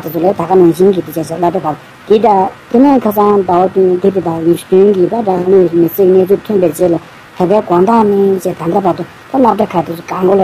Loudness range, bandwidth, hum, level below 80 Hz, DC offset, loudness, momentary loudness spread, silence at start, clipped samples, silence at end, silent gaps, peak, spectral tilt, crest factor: 2 LU; 15.5 kHz; none; -48 dBFS; under 0.1%; -11 LUFS; 8 LU; 0 s; 0.2%; 0 s; none; 0 dBFS; -7.5 dB/octave; 10 dB